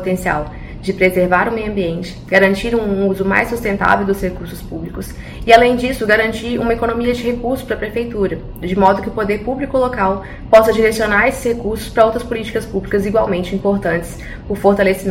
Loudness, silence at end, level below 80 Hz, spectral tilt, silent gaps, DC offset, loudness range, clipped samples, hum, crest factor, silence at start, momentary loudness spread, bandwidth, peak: -16 LUFS; 0 s; -32 dBFS; -6 dB/octave; none; under 0.1%; 3 LU; 0.2%; none; 16 dB; 0 s; 13 LU; 16.5 kHz; 0 dBFS